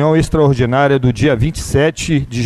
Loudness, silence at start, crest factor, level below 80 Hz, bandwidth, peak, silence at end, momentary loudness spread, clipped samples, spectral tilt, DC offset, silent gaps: -14 LUFS; 0 s; 12 dB; -30 dBFS; 13 kHz; -2 dBFS; 0 s; 5 LU; under 0.1%; -6.5 dB/octave; under 0.1%; none